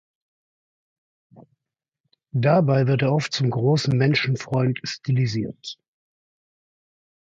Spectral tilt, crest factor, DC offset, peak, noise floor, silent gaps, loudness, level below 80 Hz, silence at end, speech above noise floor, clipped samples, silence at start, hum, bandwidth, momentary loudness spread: -6.5 dB/octave; 18 dB; under 0.1%; -6 dBFS; -87 dBFS; 2.00-2.04 s; -22 LUFS; -60 dBFS; 1.55 s; 66 dB; under 0.1%; 1.35 s; none; 7.8 kHz; 12 LU